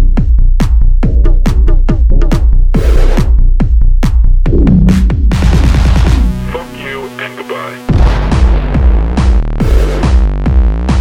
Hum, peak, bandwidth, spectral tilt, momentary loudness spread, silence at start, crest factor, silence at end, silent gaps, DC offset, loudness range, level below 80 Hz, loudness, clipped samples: none; 0 dBFS; 9 kHz; -7.5 dB/octave; 11 LU; 0 s; 8 dB; 0 s; none; under 0.1%; 3 LU; -8 dBFS; -12 LUFS; 0.2%